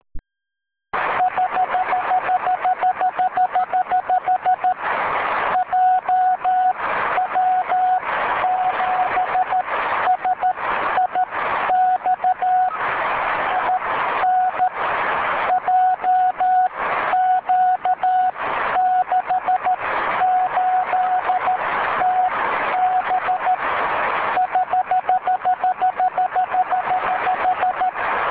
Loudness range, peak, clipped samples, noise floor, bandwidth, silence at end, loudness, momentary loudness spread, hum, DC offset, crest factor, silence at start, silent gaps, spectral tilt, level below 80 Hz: 1 LU; -6 dBFS; under 0.1%; -84 dBFS; 4 kHz; 0 s; -19 LUFS; 3 LU; none; under 0.1%; 14 dB; 0.15 s; none; -6.5 dB/octave; -54 dBFS